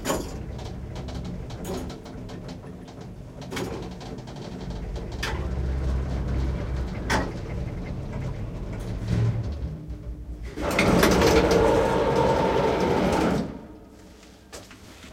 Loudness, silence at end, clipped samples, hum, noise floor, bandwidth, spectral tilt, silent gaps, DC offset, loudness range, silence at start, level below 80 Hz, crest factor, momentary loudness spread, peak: -26 LUFS; 0 s; under 0.1%; none; -48 dBFS; 16.5 kHz; -5.5 dB/octave; none; under 0.1%; 14 LU; 0 s; -34 dBFS; 22 dB; 20 LU; -4 dBFS